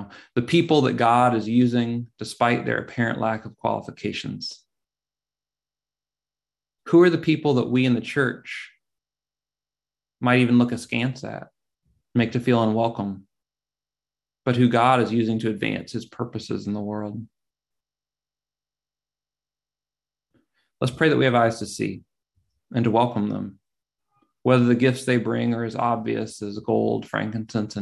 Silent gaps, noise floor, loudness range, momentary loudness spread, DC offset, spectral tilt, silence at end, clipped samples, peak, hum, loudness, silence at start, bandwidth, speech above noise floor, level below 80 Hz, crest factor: none; under -90 dBFS; 9 LU; 14 LU; under 0.1%; -6.5 dB/octave; 0 s; under 0.1%; -4 dBFS; 50 Hz at -65 dBFS; -22 LUFS; 0 s; 12 kHz; over 68 dB; -60 dBFS; 20 dB